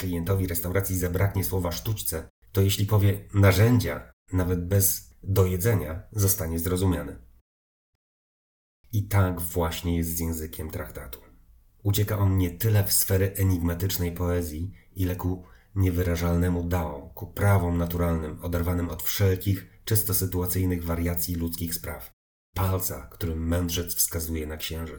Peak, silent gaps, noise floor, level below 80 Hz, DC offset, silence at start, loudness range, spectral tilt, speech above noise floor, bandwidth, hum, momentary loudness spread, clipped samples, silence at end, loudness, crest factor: -8 dBFS; 2.30-2.42 s, 4.13-4.26 s, 7.41-8.84 s, 22.13-22.53 s; -56 dBFS; -44 dBFS; under 0.1%; 0 s; 6 LU; -5.5 dB/octave; 30 dB; over 20 kHz; none; 11 LU; under 0.1%; 0 s; -26 LUFS; 18 dB